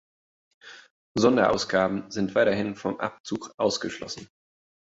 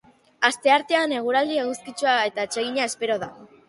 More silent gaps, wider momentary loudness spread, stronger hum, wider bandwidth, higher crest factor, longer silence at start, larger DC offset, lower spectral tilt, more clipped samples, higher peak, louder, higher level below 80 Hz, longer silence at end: first, 0.90-1.15 s, 3.20-3.24 s, 3.54-3.58 s vs none; first, 13 LU vs 8 LU; neither; second, 8 kHz vs 11.5 kHz; about the same, 20 dB vs 20 dB; first, 0.65 s vs 0.4 s; neither; first, -4.5 dB/octave vs -2 dB/octave; neither; about the same, -6 dBFS vs -4 dBFS; second, -26 LUFS vs -23 LUFS; first, -58 dBFS vs -70 dBFS; first, 0.7 s vs 0.25 s